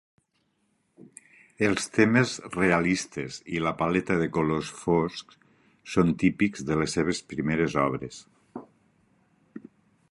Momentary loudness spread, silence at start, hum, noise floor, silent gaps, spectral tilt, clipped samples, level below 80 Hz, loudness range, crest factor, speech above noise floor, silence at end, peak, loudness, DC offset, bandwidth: 22 LU; 1.6 s; none; -73 dBFS; none; -5.5 dB/octave; under 0.1%; -54 dBFS; 4 LU; 22 dB; 47 dB; 0.5 s; -6 dBFS; -26 LUFS; under 0.1%; 11.5 kHz